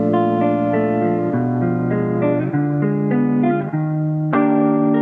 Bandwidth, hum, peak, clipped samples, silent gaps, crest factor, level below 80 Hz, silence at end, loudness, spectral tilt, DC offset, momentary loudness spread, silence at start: 3.7 kHz; none; -6 dBFS; under 0.1%; none; 12 dB; -56 dBFS; 0 s; -18 LUFS; -11.5 dB/octave; under 0.1%; 4 LU; 0 s